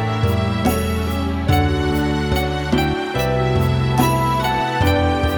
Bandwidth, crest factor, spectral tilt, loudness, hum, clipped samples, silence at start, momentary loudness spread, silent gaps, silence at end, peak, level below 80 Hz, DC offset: 20 kHz; 16 dB; -6 dB/octave; -18 LUFS; none; under 0.1%; 0 s; 4 LU; none; 0 s; -2 dBFS; -28 dBFS; under 0.1%